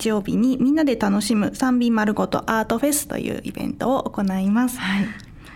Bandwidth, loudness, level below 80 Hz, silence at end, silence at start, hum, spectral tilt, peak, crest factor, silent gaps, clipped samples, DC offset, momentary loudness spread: 17 kHz; -21 LUFS; -48 dBFS; 0 s; 0 s; none; -5 dB/octave; -6 dBFS; 16 dB; none; under 0.1%; under 0.1%; 8 LU